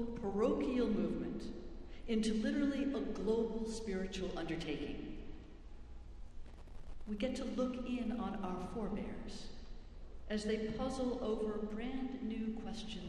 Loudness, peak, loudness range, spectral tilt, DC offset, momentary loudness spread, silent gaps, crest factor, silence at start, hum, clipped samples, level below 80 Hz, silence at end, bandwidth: -40 LUFS; -22 dBFS; 7 LU; -6 dB/octave; under 0.1%; 21 LU; none; 16 dB; 0 s; none; under 0.1%; -52 dBFS; 0 s; 11.5 kHz